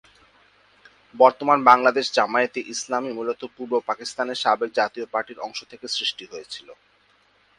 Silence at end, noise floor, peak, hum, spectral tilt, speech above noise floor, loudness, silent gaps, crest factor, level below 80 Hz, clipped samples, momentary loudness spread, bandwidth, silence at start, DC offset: 0.85 s; -61 dBFS; 0 dBFS; none; -2.5 dB/octave; 38 dB; -22 LUFS; none; 24 dB; -72 dBFS; under 0.1%; 17 LU; 11.5 kHz; 1.15 s; under 0.1%